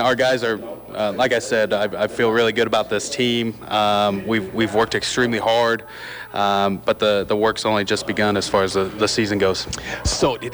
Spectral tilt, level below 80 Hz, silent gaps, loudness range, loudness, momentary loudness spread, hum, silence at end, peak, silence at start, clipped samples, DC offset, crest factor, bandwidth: -4 dB/octave; -42 dBFS; none; 1 LU; -20 LUFS; 6 LU; none; 0 s; -6 dBFS; 0 s; under 0.1%; under 0.1%; 14 dB; over 20 kHz